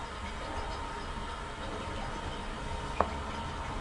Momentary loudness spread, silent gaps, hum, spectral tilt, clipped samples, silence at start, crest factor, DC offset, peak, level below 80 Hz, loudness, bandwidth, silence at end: 6 LU; none; none; -5 dB/octave; under 0.1%; 0 s; 30 dB; under 0.1%; -6 dBFS; -42 dBFS; -38 LUFS; 11.5 kHz; 0 s